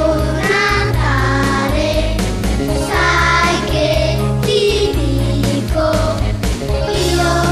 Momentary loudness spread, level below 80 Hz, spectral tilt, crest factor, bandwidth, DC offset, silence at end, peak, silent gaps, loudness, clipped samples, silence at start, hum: 5 LU; -22 dBFS; -5 dB/octave; 12 dB; 14 kHz; under 0.1%; 0 s; -2 dBFS; none; -15 LUFS; under 0.1%; 0 s; none